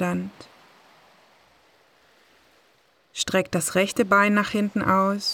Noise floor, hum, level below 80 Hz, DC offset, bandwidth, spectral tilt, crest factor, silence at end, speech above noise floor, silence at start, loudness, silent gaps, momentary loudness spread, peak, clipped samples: -62 dBFS; none; -60 dBFS; under 0.1%; 17.5 kHz; -4 dB/octave; 18 dB; 0 s; 39 dB; 0 s; -22 LUFS; none; 12 LU; -6 dBFS; under 0.1%